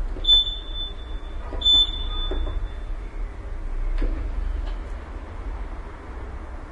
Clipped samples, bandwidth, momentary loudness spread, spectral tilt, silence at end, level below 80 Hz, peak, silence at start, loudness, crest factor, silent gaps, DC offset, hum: under 0.1%; 7.4 kHz; 21 LU; -4 dB/octave; 0 s; -28 dBFS; -8 dBFS; 0 s; -22 LUFS; 18 dB; none; under 0.1%; none